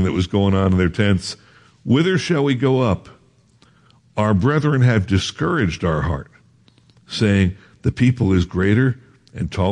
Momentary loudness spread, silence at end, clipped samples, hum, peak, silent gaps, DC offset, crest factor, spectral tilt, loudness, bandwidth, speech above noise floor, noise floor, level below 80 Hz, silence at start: 12 LU; 0 s; under 0.1%; none; -4 dBFS; none; under 0.1%; 16 dB; -7 dB/octave; -19 LUFS; 10.5 kHz; 37 dB; -54 dBFS; -44 dBFS; 0 s